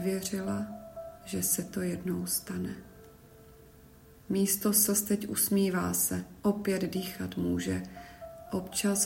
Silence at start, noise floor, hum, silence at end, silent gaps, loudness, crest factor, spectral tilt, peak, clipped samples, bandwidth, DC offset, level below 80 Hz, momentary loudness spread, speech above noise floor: 0 s; -55 dBFS; none; 0 s; none; -30 LUFS; 20 dB; -4 dB/octave; -12 dBFS; under 0.1%; 16.5 kHz; under 0.1%; -60 dBFS; 17 LU; 25 dB